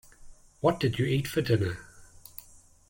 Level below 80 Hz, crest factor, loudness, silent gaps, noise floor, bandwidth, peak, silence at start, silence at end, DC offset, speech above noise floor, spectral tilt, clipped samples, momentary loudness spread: -54 dBFS; 22 dB; -28 LUFS; none; -55 dBFS; 17 kHz; -10 dBFS; 0.2 s; 0.85 s; under 0.1%; 29 dB; -6.5 dB/octave; under 0.1%; 19 LU